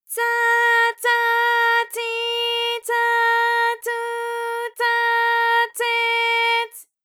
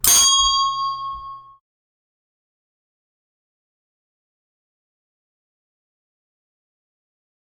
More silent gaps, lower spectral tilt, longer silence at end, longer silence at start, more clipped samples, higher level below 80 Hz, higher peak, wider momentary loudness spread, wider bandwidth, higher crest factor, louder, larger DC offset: neither; second, 4.5 dB/octave vs 2 dB/octave; second, 0.2 s vs 6.1 s; about the same, 0.1 s vs 0.05 s; neither; second, under -90 dBFS vs -50 dBFS; second, -8 dBFS vs 0 dBFS; second, 9 LU vs 22 LU; about the same, 19.5 kHz vs 18 kHz; second, 12 dB vs 24 dB; second, -19 LUFS vs -15 LUFS; neither